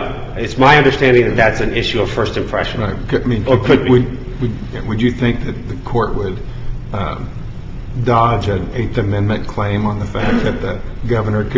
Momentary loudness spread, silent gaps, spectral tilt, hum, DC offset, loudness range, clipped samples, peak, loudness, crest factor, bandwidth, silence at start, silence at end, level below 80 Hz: 14 LU; none; -7 dB/octave; none; under 0.1%; 6 LU; under 0.1%; 0 dBFS; -16 LUFS; 16 dB; 7.6 kHz; 0 s; 0 s; -28 dBFS